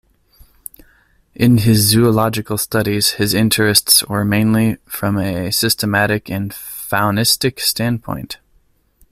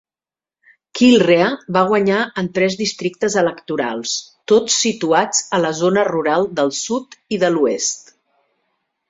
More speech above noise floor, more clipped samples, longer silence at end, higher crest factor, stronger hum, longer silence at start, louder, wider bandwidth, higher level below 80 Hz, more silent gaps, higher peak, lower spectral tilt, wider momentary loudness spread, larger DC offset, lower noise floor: second, 41 dB vs over 73 dB; neither; second, 0.75 s vs 1.1 s; about the same, 16 dB vs 16 dB; neither; first, 1.4 s vs 0.95 s; about the same, -15 LUFS vs -17 LUFS; first, 16 kHz vs 8 kHz; first, -44 dBFS vs -60 dBFS; neither; about the same, 0 dBFS vs -2 dBFS; about the same, -4 dB/octave vs -3.5 dB/octave; first, 15 LU vs 9 LU; neither; second, -56 dBFS vs under -90 dBFS